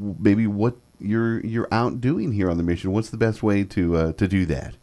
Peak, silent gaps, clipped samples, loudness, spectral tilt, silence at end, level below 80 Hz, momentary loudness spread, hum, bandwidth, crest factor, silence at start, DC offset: -4 dBFS; none; under 0.1%; -23 LUFS; -8 dB/octave; 0.1 s; -42 dBFS; 5 LU; none; 11 kHz; 18 dB; 0 s; under 0.1%